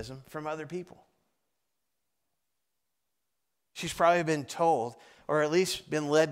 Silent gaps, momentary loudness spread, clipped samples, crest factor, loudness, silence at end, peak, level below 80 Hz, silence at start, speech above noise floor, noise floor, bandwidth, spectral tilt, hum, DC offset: none; 16 LU; under 0.1%; 20 dB; -29 LUFS; 0 s; -12 dBFS; -66 dBFS; 0 s; 56 dB; -85 dBFS; 16 kHz; -4.5 dB/octave; none; under 0.1%